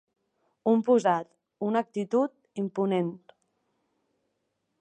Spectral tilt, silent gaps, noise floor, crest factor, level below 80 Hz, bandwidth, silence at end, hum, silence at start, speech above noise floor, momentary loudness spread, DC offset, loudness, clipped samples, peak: -7 dB/octave; none; -79 dBFS; 18 dB; -82 dBFS; 9.2 kHz; 1.65 s; none; 0.65 s; 53 dB; 12 LU; under 0.1%; -28 LUFS; under 0.1%; -10 dBFS